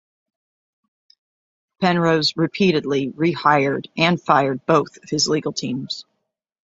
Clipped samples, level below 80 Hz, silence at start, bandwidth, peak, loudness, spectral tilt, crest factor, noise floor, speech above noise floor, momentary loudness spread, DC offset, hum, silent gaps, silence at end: under 0.1%; -60 dBFS; 1.8 s; 8 kHz; -2 dBFS; -19 LUFS; -5 dB/octave; 20 dB; -76 dBFS; 57 dB; 9 LU; under 0.1%; none; none; 0.65 s